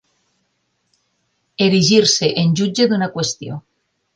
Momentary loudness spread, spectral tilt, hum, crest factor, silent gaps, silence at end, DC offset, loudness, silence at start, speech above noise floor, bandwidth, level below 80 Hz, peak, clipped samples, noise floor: 18 LU; -4.5 dB/octave; none; 18 dB; none; 0.55 s; under 0.1%; -15 LUFS; 1.6 s; 53 dB; 10.5 kHz; -58 dBFS; 0 dBFS; under 0.1%; -68 dBFS